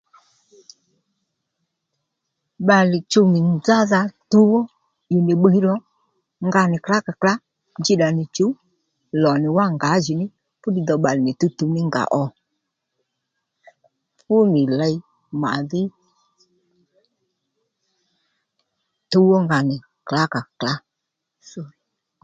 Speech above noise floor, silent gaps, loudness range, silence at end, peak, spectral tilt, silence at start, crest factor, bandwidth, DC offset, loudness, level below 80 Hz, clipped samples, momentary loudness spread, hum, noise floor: 63 dB; none; 7 LU; 0.55 s; 0 dBFS; -6.5 dB/octave; 2.6 s; 20 dB; 7.8 kHz; under 0.1%; -19 LUFS; -64 dBFS; under 0.1%; 14 LU; none; -80 dBFS